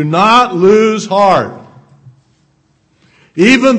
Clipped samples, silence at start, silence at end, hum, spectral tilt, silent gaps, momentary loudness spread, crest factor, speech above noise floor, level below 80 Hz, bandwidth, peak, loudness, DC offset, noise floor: 0.2%; 0 s; 0 s; none; -5 dB/octave; none; 8 LU; 12 dB; 46 dB; -50 dBFS; 11 kHz; 0 dBFS; -9 LUFS; under 0.1%; -55 dBFS